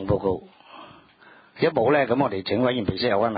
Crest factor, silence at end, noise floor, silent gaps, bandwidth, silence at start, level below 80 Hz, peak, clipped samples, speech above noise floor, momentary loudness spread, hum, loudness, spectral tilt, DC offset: 18 dB; 0 s; -52 dBFS; none; 5 kHz; 0 s; -48 dBFS; -6 dBFS; under 0.1%; 30 dB; 5 LU; none; -23 LUFS; -11 dB/octave; under 0.1%